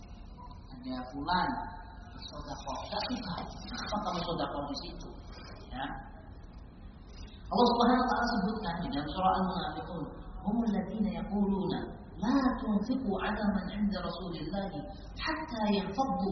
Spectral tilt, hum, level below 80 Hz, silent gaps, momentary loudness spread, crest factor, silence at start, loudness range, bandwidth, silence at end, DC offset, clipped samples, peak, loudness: -4.5 dB/octave; none; -48 dBFS; none; 20 LU; 20 dB; 0 s; 8 LU; 6.4 kHz; 0 s; under 0.1%; under 0.1%; -14 dBFS; -33 LUFS